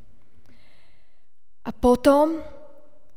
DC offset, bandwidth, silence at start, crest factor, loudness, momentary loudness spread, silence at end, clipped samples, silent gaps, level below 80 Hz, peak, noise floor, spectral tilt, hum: 2%; 16 kHz; 1.65 s; 20 dB; -20 LUFS; 21 LU; 0.65 s; under 0.1%; none; -44 dBFS; -4 dBFS; -69 dBFS; -6 dB/octave; none